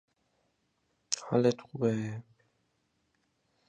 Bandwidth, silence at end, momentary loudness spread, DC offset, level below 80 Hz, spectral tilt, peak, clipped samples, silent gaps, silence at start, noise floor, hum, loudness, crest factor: 11 kHz; 1.5 s; 11 LU; under 0.1%; -74 dBFS; -5 dB/octave; -10 dBFS; under 0.1%; none; 1.1 s; -77 dBFS; none; -31 LUFS; 26 dB